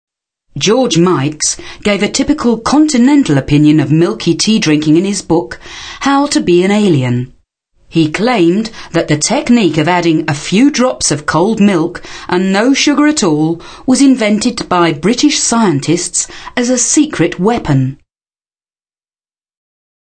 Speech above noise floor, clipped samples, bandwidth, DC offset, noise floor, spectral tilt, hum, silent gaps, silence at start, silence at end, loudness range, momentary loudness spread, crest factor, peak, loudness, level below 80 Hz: over 79 dB; under 0.1%; 9.4 kHz; 0.3%; under -90 dBFS; -4.5 dB/octave; none; none; 0.55 s; 2.15 s; 3 LU; 8 LU; 12 dB; 0 dBFS; -11 LUFS; -40 dBFS